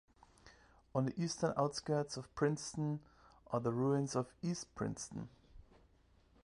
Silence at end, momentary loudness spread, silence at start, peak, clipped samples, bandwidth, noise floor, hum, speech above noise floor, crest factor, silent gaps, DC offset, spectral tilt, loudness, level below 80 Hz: 0.8 s; 10 LU; 0.45 s; -20 dBFS; under 0.1%; 11 kHz; -69 dBFS; none; 31 dB; 20 dB; none; under 0.1%; -6 dB/octave; -39 LUFS; -66 dBFS